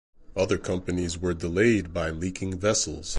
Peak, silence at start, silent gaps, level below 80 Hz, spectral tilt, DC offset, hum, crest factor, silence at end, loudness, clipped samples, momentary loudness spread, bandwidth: -10 dBFS; 0.2 s; none; -42 dBFS; -4.5 dB/octave; under 0.1%; none; 16 dB; 0 s; -27 LUFS; under 0.1%; 8 LU; 11.5 kHz